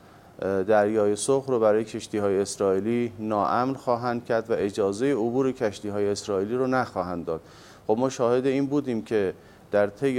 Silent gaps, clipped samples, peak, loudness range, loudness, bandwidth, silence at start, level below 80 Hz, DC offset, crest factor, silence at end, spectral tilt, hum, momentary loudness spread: none; under 0.1%; -8 dBFS; 3 LU; -25 LUFS; 13.5 kHz; 0.4 s; -62 dBFS; under 0.1%; 16 dB; 0 s; -5.5 dB/octave; none; 7 LU